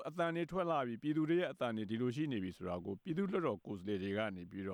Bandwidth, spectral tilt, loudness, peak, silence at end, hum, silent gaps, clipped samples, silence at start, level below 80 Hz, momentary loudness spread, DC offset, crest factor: 11 kHz; -7.5 dB/octave; -39 LUFS; -24 dBFS; 0 s; none; none; under 0.1%; 0 s; -72 dBFS; 7 LU; under 0.1%; 14 dB